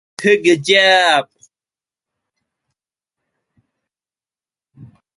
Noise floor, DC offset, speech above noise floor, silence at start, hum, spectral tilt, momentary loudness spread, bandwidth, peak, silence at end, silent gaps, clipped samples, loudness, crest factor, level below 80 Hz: under -90 dBFS; under 0.1%; over 77 dB; 0.2 s; none; -3 dB/octave; 5 LU; 11.5 kHz; -2 dBFS; 0.3 s; none; under 0.1%; -12 LUFS; 18 dB; -66 dBFS